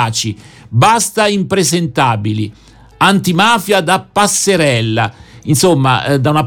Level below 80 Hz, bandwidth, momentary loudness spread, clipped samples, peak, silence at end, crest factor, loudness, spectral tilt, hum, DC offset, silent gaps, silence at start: -46 dBFS; 19 kHz; 9 LU; under 0.1%; 0 dBFS; 0 s; 12 dB; -12 LUFS; -4 dB/octave; none; under 0.1%; none; 0 s